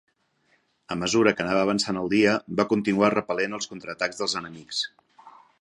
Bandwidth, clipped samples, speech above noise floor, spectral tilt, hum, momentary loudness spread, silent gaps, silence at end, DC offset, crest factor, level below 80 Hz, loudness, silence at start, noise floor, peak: 11 kHz; under 0.1%; 43 dB; -4 dB/octave; none; 10 LU; none; 0.3 s; under 0.1%; 22 dB; -60 dBFS; -25 LUFS; 0.9 s; -67 dBFS; -4 dBFS